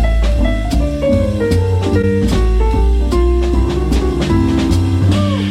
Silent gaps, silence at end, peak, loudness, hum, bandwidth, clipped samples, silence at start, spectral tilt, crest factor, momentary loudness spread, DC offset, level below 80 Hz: none; 0 s; -2 dBFS; -15 LUFS; none; 12.5 kHz; under 0.1%; 0 s; -7.5 dB/octave; 10 dB; 2 LU; under 0.1%; -16 dBFS